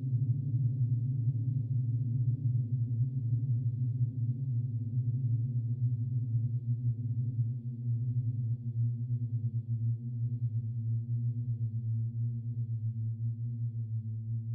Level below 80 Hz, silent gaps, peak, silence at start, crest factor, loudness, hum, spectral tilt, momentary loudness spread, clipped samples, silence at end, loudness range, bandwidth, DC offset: -62 dBFS; none; -20 dBFS; 0 s; 12 dB; -34 LUFS; none; -17 dB/octave; 4 LU; under 0.1%; 0 s; 3 LU; 0.6 kHz; under 0.1%